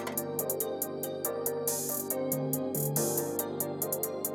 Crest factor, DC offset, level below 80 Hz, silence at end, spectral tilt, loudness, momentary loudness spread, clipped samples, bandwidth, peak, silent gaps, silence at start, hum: 18 dB; under 0.1%; -82 dBFS; 0 s; -4.5 dB/octave; -32 LUFS; 4 LU; under 0.1%; over 20 kHz; -16 dBFS; none; 0 s; 50 Hz at -65 dBFS